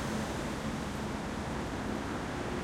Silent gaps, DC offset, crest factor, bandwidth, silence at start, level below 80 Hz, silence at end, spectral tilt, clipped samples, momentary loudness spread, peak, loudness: none; under 0.1%; 12 dB; 16.5 kHz; 0 s; -48 dBFS; 0 s; -5 dB/octave; under 0.1%; 2 LU; -24 dBFS; -36 LUFS